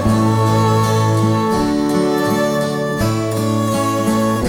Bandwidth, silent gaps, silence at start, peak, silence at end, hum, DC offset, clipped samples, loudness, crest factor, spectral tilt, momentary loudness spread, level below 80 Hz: 18 kHz; none; 0 s; -4 dBFS; 0 s; none; under 0.1%; under 0.1%; -16 LUFS; 12 dB; -6 dB/octave; 4 LU; -38 dBFS